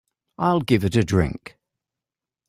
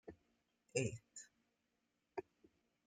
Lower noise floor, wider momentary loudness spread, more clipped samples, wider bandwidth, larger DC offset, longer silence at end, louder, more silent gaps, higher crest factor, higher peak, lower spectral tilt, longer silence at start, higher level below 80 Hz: about the same, -88 dBFS vs -86 dBFS; second, 7 LU vs 18 LU; neither; first, 16 kHz vs 9.6 kHz; neither; first, 1.1 s vs 0.65 s; first, -21 LUFS vs -46 LUFS; neither; second, 20 dB vs 26 dB; first, -4 dBFS vs -24 dBFS; first, -7 dB/octave vs -4.5 dB/octave; first, 0.4 s vs 0.05 s; first, -44 dBFS vs -78 dBFS